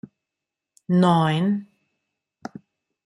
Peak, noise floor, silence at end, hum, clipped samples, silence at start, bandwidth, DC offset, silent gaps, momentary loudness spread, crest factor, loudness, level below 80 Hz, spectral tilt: -6 dBFS; -86 dBFS; 1.45 s; none; under 0.1%; 0.9 s; 11 kHz; under 0.1%; none; 22 LU; 20 dB; -21 LUFS; -66 dBFS; -7.5 dB/octave